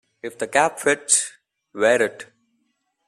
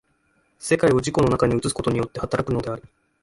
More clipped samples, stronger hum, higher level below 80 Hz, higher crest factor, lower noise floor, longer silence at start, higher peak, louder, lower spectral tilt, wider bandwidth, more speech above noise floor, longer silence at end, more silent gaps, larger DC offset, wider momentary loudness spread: neither; neither; second, -70 dBFS vs -44 dBFS; about the same, 20 dB vs 16 dB; first, -71 dBFS vs -66 dBFS; second, 0.25 s vs 0.6 s; about the same, -4 dBFS vs -6 dBFS; about the same, -20 LUFS vs -22 LUFS; second, -1.5 dB/octave vs -6 dB/octave; first, 13.5 kHz vs 11.5 kHz; first, 51 dB vs 44 dB; first, 0.85 s vs 0.4 s; neither; neither; first, 18 LU vs 11 LU